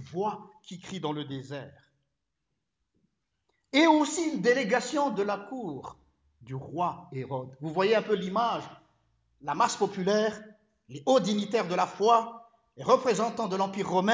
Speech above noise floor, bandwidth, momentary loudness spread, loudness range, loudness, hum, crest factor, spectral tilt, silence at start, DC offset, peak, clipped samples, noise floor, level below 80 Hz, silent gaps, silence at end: 55 dB; 8 kHz; 17 LU; 5 LU; -28 LUFS; none; 20 dB; -4.5 dB/octave; 0 s; under 0.1%; -8 dBFS; under 0.1%; -83 dBFS; -70 dBFS; none; 0 s